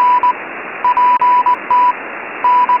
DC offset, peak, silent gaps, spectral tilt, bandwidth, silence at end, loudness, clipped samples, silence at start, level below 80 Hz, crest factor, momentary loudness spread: under 0.1%; -2 dBFS; none; -4.5 dB/octave; 5.2 kHz; 0 s; -13 LUFS; under 0.1%; 0 s; -62 dBFS; 10 dB; 12 LU